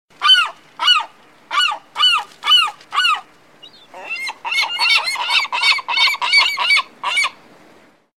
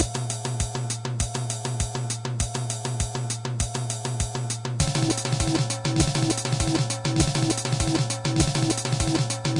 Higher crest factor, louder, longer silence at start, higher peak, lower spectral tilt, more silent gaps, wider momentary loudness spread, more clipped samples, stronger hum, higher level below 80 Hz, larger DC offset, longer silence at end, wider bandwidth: about the same, 16 dB vs 16 dB; first, -15 LUFS vs -25 LUFS; first, 0.2 s vs 0 s; first, -2 dBFS vs -8 dBFS; second, 3 dB/octave vs -4.5 dB/octave; neither; first, 11 LU vs 6 LU; neither; neither; second, -74 dBFS vs -38 dBFS; first, 0.2% vs under 0.1%; first, 0.85 s vs 0 s; first, 16.5 kHz vs 11.5 kHz